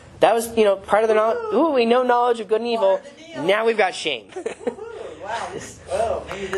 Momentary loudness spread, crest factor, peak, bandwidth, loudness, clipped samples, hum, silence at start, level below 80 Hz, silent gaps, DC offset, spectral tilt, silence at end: 14 LU; 20 dB; 0 dBFS; 13 kHz; -20 LUFS; under 0.1%; none; 0.05 s; -54 dBFS; none; under 0.1%; -4 dB/octave; 0 s